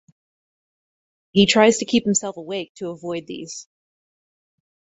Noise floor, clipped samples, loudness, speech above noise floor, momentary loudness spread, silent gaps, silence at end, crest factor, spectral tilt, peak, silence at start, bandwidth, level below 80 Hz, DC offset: under -90 dBFS; under 0.1%; -19 LUFS; over 70 dB; 18 LU; 2.69-2.75 s; 1.35 s; 22 dB; -3.5 dB/octave; -2 dBFS; 1.35 s; 8.2 kHz; -58 dBFS; under 0.1%